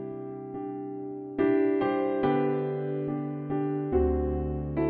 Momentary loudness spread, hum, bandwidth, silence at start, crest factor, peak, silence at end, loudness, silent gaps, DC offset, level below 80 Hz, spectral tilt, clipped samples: 12 LU; none; 4.5 kHz; 0 s; 14 dB; -14 dBFS; 0 s; -29 LUFS; none; under 0.1%; -42 dBFS; -11.5 dB/octave; under 0.1%